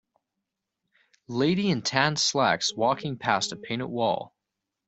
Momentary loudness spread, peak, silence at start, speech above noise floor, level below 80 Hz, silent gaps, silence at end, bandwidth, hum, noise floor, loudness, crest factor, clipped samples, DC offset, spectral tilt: 10 LU; -4 dBFS; 1.3 s; 59 dB; -66 dBFS; none; 0.6 s; 8.2 kHz; none; -85 dBFS; -26 LUFS; 22 dB; under 0.1%; under 0.1%; -4 dB/octave